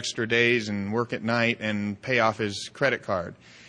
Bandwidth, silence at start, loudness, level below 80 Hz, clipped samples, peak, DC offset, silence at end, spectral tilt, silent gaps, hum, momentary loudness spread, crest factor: 10 kHz; 0 s; -25 LUFS; -64 dBFS; under 0.1%; -6 dBFS; under 0.1%; 0 s; -4.5 dB/octave; none; none; 9 LU; 20 dB